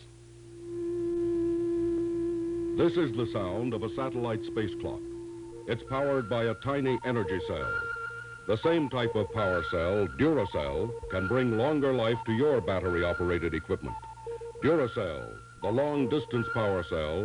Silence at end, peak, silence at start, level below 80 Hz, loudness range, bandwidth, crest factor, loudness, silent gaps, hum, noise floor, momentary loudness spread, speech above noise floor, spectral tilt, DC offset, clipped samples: 0 s; -14 dBFS; 0 s; -52 dBFS; 3 LU; 11 kHz; 16 dB; -30 LUFS; none; none; -50 dBFS; 11 LU; 21 dB; -7.5 dB/octave; under 0.1%; under 0.1%